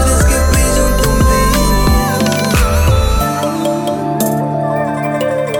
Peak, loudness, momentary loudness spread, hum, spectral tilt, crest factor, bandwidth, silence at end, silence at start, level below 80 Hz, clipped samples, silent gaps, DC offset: -2 dBFS; -13 LUFS; 5 LU; none; -5 dB/octave; 10 dB; 17 kHz; 0 s; 0 s; -16 dBFS; under 0.1%; none; under 0.1%